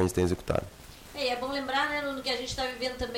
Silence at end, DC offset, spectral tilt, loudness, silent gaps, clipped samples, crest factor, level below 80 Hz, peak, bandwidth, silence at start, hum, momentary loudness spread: 0 s; under 0.1%; -4.5 dB/octave; -30 LUFS; none; under 0.1%; 14 dB; -48 dBFS; -16 dBFS; 16.5 kHz; 0 s; none; 8 LU